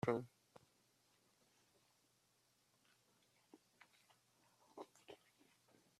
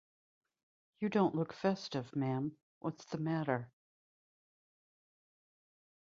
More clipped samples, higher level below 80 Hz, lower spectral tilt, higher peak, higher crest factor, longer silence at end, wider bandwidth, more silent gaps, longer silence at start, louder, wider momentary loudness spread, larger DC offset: neither; second, -86 dBFS vs -78 dBFS; about the same, -6.5 dB/octave vs -6.5 dB/octave; second, -22 dBFS vs -18 dBFS; first, 32 dB vs 22 dB; second, 0.85 s vs 2.45 s; first, 14 kHz vs 7.4 kHz; second, none vs 2.63-2.81 s; second, 0.05 s vs 1 s; second, -49 LUFS vs -37 LUFS; first, 24 LU vs 11 LU; neither